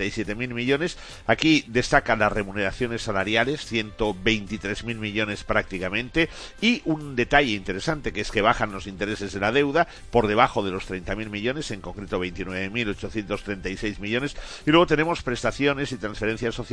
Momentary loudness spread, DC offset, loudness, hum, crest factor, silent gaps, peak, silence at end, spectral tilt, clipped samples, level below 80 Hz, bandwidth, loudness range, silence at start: 10 LU; under 0.1%; -24 LUFS; none; 22 dB; none; -2 dBFS; 0 s; -5 dB/octave; under 0.1%; -40 dBFS; 11 kHz; 4 LU; 0 s